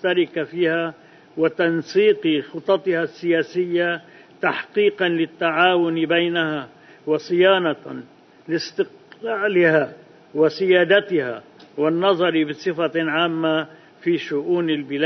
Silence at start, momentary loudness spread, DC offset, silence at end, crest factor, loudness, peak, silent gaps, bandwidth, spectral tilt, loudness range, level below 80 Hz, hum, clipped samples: 0 s; 13 LU; under 0.1%; 0 s; 18 dB; -20 LUFS; -2 dBFS; none; 6.4 kHz; -6 dB/octave; 2 LU; -68 dBFS; none; under 0.1%